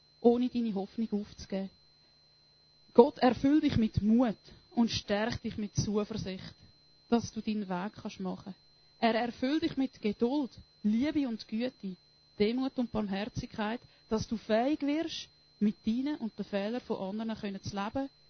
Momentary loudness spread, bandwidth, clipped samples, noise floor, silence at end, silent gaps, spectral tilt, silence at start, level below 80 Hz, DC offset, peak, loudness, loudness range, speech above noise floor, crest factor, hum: 12 LU; 6.6 kHz; under 0.1%; -64 dBFS; 0.2 s; none; -6 dB/octave; 0.2 s; -56 dBFS; under 0.1%; -6 dBFS; -32 LUFS; 6 LU; 33 dB; 26 dB; none